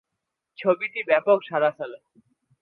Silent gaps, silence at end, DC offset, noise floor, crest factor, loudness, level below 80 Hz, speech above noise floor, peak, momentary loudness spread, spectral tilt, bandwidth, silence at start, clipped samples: none; 0.65 s; under 0.1%; -83 dBFS; 20 dB; -23 LUFS; -82 dBFS; 59 dB; -6 dBFS; 12 LU; -8 dB/octave; 4.6 kHz; 0.6 s; under 0.1%